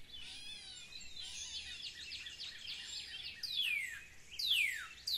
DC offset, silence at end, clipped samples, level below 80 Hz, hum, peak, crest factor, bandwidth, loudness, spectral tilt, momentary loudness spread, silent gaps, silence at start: under 0.1%; 0 s; under 0.1%; -68 dBFS; none; -24 dBFS; 20 dB; 16 kHz; -40 LUFS; 1.5 dB/octave; 16 LU; none; 0 s